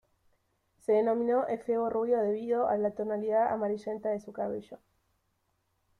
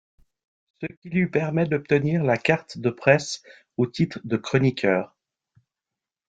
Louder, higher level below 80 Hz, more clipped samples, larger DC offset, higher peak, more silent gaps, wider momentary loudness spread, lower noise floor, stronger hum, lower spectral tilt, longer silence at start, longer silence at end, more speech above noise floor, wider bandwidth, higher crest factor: second, -30 LUFS vs -23 LUFS; second, -72 dBFS vs -60 dBFS; neither; neither; second, -16 dBFS vs -2 dBFS; second, none vs 0.97-1.02 s; second, 9 LU vs 15 LU; second, -76 dBFS vs -88 dBFS; neither; first, -8 dB/octave vs -6.5 dB/octave; about the same, 0.9 s vs 0.8 s; about the same, 1.25 s vs 1.2 s; second, 47 dB vs 65 dB; first, 11 kHz vs 9.2 kHz; second, 14 dB vs 22 dB